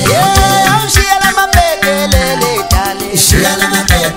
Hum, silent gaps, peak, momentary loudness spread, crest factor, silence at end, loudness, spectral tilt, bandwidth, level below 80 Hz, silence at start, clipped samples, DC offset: none; none; 0 dBFS; 4 LU; 10 dB; 0 s; -9 LUFS; -3 dB/octave; over 20 kHz; -18 dBFS; 0 s; 0.3%; under 0.1%